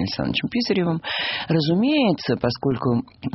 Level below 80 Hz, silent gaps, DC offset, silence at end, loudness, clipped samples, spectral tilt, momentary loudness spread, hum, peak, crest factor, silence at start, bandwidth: -52 dBFS; none; under 0.1%; 0 s; -22 LUFS; under 0.1%; -4.5 dB/octave; 5 LU; none; -4 dBFS; 16 dB; 0 s; 6 kHz